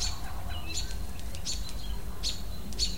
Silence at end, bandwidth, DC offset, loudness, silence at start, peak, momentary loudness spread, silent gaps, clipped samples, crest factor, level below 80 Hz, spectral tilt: 0 s; 16.5 kHz; 2%; -36 LUFS; 0 s; -16 dBFS; 6 LU; none; under 0.1%; 18 dB; -38 dBFS; -2.5 dB/octave